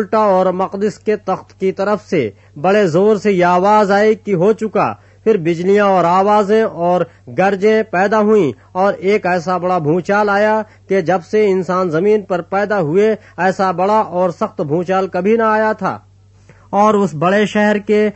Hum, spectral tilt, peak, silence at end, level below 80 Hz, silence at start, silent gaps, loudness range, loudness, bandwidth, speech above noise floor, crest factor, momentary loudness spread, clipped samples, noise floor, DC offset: none; -7 dB/octave; -2 dBFS; 0.05 s; -56 dBFS; 0 s; none; 3 LU; -15 LUFS; 8.4 kHz; 31 dB; 14 dB; 7 LU; under 0.1%; -45 dBFS; under 0.1%